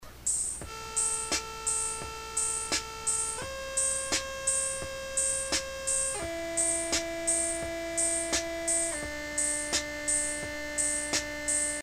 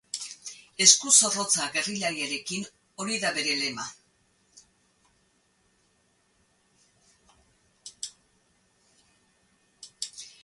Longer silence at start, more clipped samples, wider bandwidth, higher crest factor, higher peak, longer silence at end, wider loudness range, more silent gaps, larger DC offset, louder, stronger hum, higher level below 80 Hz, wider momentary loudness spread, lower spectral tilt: second, 0 s vs 0.15 s; neither; first, 15.5 kHz vs 12 kHz; second, 18 dB vs 28 dB; second, -12 dBFS vs -2 dBFS; second, 0 s vs 0.15 s; second, 1 LU vs 25 LU; neither; neither; second, -29 LUFS vs -23 LUFS; neither; first, -52 dBFS vs -74 dBFS; second, 6 LU vs 22 LU; about the same, -0.5 dB/octave vs 0 dB/octave